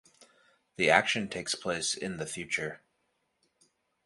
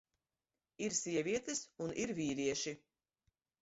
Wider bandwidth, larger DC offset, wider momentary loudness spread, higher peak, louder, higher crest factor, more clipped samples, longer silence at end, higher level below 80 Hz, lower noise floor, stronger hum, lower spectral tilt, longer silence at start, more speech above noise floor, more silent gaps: first, 11.5 kHz vs 8 kHz; neither; first, 13 LU vs 7 LU; first, -6 dBFS vs -22 dBFS; first, -30 LUFS vs -39 LUFS; first, 28 dB vs 20 dB; neither; first, 1.3 s vs 0.85 s; first, -66 dBFS vs -72 dBFS; second, -77 dBFS vs under -90 dBFS; neither; second, -2.5 dB/octave vs -4.5 dB/octave; second, 0.2 s vs 0.8 s; second, 47 dB vs over 51 dB; neither